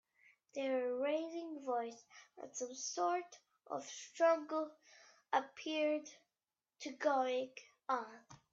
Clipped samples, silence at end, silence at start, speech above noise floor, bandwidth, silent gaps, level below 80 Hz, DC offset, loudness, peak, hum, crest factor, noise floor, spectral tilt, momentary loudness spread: under 0.1%; 0.2 s; 0.55 s; over 51 dB; 7.8 kHz; none; under -90 dBFS; under 0.1%; -40 LUFS; -22 dBFS; none; 20 dB; under -90 dBFS; -2 dB/octave; 16 LU